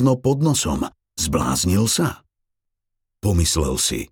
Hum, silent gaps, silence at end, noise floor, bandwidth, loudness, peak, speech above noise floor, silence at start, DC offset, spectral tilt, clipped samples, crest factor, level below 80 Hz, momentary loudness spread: none; none; 0.05 s; -78 dBFS; over 20 kHz; -20 LUFS; -6 dBFS; 58 dB; 0 s; under 0.1%; -4.5 dB/octave; under 0.1%; 16 dB; -34 dBFS; 7 LU